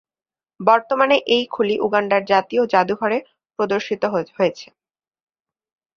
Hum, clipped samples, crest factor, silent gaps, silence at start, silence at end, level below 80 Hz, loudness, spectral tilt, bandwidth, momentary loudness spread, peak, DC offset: none; under 0.1%; 18 dB; none; 0.6 s; 1.3 s; -66 dBFS; -19 LUFS; -5 dB/octave; 7.2 kHz; 6 LU; -2 dBFS; under 0.1%